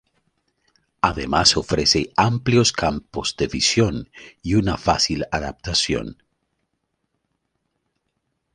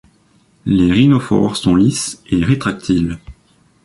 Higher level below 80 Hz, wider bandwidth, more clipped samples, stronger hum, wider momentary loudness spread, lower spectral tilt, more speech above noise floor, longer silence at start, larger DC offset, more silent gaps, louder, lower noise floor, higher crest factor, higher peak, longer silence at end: about the same, -40 dBFS vs -38 dBFS; about the same, 11 kHz vs 11.5 kHz; neither; neither; about the same, 10 LU vs 10 LU; second, -4 dB/octave vs -6 dB/octave; first, 54 dB vs 40 dB; first, 1.05 s vs 0.65 s; neither; neither; second, -20 LUFS vs -15 LUFS; first, -75 dBFS vs -54 dBFS; first, 22 dB vs 14 dB; about the same, -2 dBFS vs -2 dBFS; first, 2.4 s vs 0.55 s